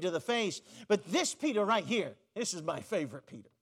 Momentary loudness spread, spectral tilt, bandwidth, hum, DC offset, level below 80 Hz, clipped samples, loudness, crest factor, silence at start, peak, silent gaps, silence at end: 12 LU; -3.5 dB/octave; 15.5 kHz; none; under 0.1%; -84 dBFS; under 0.1%; -33 LUFS; 16 dB; 0 s; -16 dBFS; none; 0.2 s